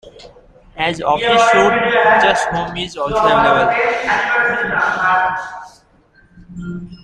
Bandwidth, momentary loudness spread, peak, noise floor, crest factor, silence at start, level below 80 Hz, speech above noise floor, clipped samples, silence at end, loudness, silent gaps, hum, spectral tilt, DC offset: 11 kHz; 16 LU; 0 dBFS; -51 dBFS; 16 dB; 0.05 s; -44 dBFS; 37 dB; under 0.1%; 0.1 s; -14 LUFS; none; none; -4 dB/octave; under 0.1%